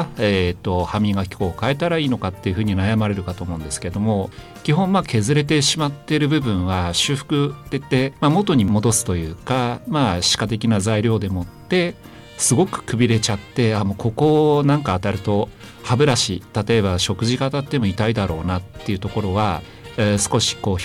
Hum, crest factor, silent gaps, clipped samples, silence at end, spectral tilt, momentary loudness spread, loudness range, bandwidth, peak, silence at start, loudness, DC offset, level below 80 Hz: none; 14 dB; none; under 0.1%; 0 s; -5 dB/octave; 9 LU; 3 LU; 15.5 kHz; -6 dBFS; 0 s; -20 LUFS; under 0.1%; -42 dBFS